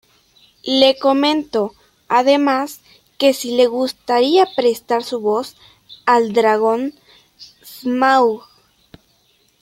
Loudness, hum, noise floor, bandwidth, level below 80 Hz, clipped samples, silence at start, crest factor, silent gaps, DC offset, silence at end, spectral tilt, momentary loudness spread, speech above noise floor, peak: -16 LUFS; none; -59 dBFS; 16.5 kHz; -64 dBFS; under 0.1%; 0.65 s; 18 dB; none; under 0.1%; 1.25 s; -3.5 dB/octave; 13 LU; 43 dB; 0 dBFS